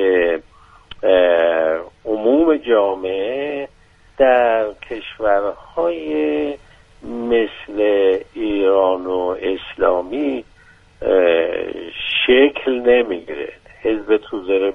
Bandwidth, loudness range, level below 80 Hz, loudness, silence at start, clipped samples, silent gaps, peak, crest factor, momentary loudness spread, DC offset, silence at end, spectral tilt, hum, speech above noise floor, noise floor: 4.5 kHz; 3 LU; -48 dBFS; -18 LUFS; 0 s; under 0.1%; none; -2 dBFS; 16 dB; 12 LU; under 0.1%; 0 s; -6 dB/octave; none; 32 dB; -50 dBFS